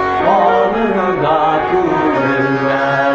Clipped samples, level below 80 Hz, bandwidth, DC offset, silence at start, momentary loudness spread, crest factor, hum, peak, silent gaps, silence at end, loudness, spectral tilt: under 0.1%; -42 dBFS; 7.8 kHz; under 0.1%; 0 s; 3 LU; 12 dB; none; -2 dBFS; none; 0 s; -14 LUFS; -7 dB/octave